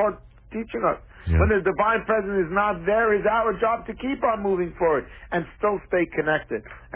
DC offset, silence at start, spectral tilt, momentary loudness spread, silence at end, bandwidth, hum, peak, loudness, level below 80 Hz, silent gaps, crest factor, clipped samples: under 0.1%; 0 s; -10.5 dB/octave; 10 LU; 0 s; 4 kHz; none; -8 dBFS; -24 LUFS; -36 dBFS; none; 16 dB; under 0.1%